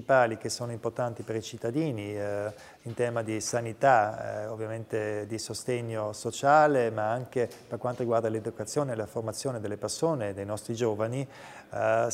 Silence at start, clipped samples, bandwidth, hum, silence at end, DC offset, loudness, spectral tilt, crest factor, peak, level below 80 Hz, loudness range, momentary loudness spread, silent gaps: 0 s; under 0.1%; 16 kHz; none; 0 s; under 0.1%; -30 LUFS; -5 dB/octave; 20 dB; -8 dBFS; -70 dBFS; 4 LU; 12 LU; none